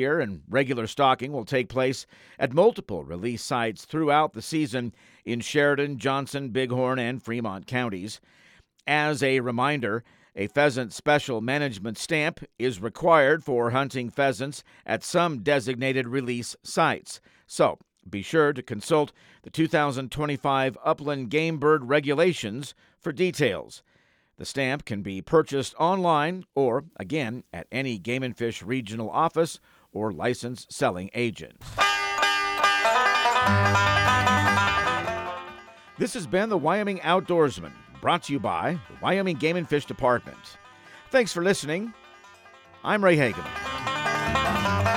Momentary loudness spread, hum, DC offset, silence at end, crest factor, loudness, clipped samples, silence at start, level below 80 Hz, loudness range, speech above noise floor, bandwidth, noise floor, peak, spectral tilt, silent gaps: 13 LU; none; under 0.1%; 0 s; 20 dB; -25 LUFS; under 0.1%; 0 s; -56 dBFS; 6 LU; 39 dB; 17 kHz; -64 dBFS; -6 dBFS; -5 dB/octave; none